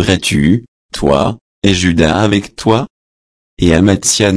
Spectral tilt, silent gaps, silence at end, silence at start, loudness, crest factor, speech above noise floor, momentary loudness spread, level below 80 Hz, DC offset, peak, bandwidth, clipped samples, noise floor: -4.5 dB/octave; 0.68-0.89 s, 1.41-1.62 s, 2.90-3.57 s; 0 s; 0 s; -12 LUFS; 12 dB; over 79 dB; 7 LU; -32 dBFS; under 0.1%; 0 dBFS; 11 kHz; 0.1%; under -90 dBFS